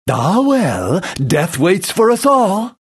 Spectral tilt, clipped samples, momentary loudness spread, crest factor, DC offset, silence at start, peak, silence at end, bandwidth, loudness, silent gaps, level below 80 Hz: -5.5 dB/octave; under 0.1%; 5 LU; 12 dB; under 0.1%; 0.05 s; -2 dBFS; 0.1 s; 13 kHz; -14 LUFS; none; -48 dBFS